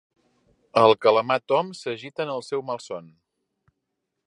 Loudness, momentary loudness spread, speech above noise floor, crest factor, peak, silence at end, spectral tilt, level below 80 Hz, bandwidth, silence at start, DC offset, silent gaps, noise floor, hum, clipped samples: -23 LUFS; 15 LU; 57 dB; 22 dB; -2 dBFS; 1.2 s; -5 dB/octave; -72 dBFS; 11 kHz; 0.75 s; under 0.1%; none; -80 dBFS; none; under 0.1%